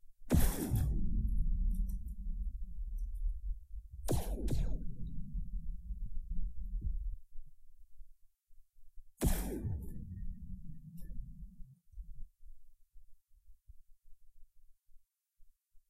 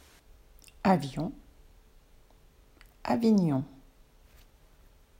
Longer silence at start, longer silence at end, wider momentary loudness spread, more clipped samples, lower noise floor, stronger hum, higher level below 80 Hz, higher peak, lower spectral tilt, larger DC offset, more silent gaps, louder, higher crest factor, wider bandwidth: second, 0.05 s vs 0.85 s; second, 0.1 s vs 1.55 s; first, 19 LU vs 15 LU; neither; about the same, -62 dBFS vs -59 dBFS; neither; first, -40 dBFS vs -56 dBFS; second, -16 dBFS vs -10 dBFS; second, -6 dB/octave vs -7.5 dB/octave; neither; neither; second, -41 LUFS vs -29 LUFS; about the same, 22 dB vs 22 dB; about the same, 16 kHz vs 16 kHz